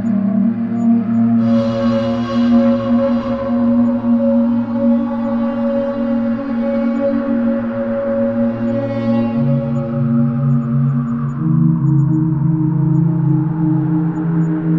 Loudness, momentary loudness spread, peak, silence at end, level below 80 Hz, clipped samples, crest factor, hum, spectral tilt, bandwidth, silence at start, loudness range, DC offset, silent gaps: -16 LUFS; 4 LU; -4 dBFS; 0 s; -46 dBFS; under 0.1%; 12 dB; none; -10.5 dB/octave; 5.6 kHz; 0 s; 3 LU; under 0.1%; none